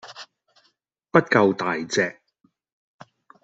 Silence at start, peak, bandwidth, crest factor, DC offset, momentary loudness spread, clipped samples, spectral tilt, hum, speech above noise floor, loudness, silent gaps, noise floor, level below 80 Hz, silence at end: 0.05 s; -2 dBFS; 8.2 kHz; 24 dB; under 0.1%; 17 LU; under 0.1%; -5 dB/octave; none; 48 dB; -21 LUFS; none; -68 dBFS; -68 dBFS; 1.3 s